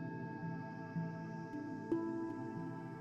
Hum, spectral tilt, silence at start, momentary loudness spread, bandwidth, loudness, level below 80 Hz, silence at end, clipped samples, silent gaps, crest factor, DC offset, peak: none; -9 dB/octave; 0 s; 6 LU; 7.8 kHz; -44 LUFS; -74 dBFS; 0 s; under 0.1%; none; 16 dB; under 0.1%; -26 dBFS